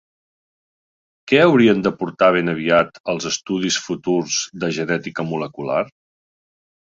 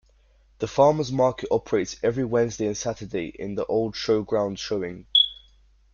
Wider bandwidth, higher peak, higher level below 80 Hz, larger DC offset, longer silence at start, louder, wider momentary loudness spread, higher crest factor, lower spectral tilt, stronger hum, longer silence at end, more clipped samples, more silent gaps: about the same, 7.8 kHz vs 7.2 kHz; first, -2 dBFS vs -6 dBFS; about the same, -58 dBFS vs -54 dBFS; neither; first, 1.25 s vs 0.6 s; first, -19 LUFS vs -24 LUFS; about the same, 11 LU vs 11 LU; about the same, 18 dB vs 20 dB; about the same, -4.5 dB/octave vs -4.5 dB/octave; neither; first, 0.95 s vs 0.6 s; neither; first, 3.00-3.04 s vs none